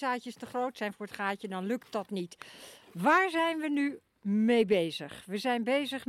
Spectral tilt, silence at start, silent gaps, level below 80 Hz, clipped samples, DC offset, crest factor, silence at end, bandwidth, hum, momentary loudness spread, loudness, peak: -5.5 dB/octave; 0 s; none; -76 dBFS; under 0.1%; under 0.1%; 18 dB; 0.05 s; 15 kHz; none; 15 LU; -31 LUFS; -14 dBFS